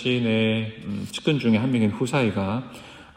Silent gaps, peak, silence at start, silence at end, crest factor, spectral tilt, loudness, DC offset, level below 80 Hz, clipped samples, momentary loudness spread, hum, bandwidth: none; -8 dBFS; 0 s; 0.1 s; 16 dB; -6.5 dB/octave; -24 LUFS; under 0.1%; -58 dBFS; under 0.1%; 11 LU; none; 14.5 kHz